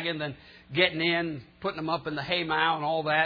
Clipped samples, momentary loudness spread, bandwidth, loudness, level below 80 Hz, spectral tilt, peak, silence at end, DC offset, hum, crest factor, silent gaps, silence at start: under 0.1%; 11 LU; 5.2 kHz; -28 LUFS; -62 dBFS; -7 dB/octave; -6 dBFS; 0 s; under 0.1%; none; 22 dB; none; 0 s